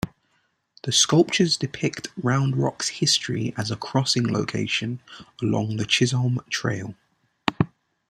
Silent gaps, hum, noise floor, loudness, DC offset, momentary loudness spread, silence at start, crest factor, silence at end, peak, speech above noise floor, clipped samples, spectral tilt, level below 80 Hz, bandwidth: none; none; -69 dBFS; -23 LUFS; under 0.1%; 10 LU; 0.05 s; 22 dB; 0.45 s; -2 dBFS; 46 dB; under 0.1%; -4 dB/octave; -56 dBFS; 14 kHz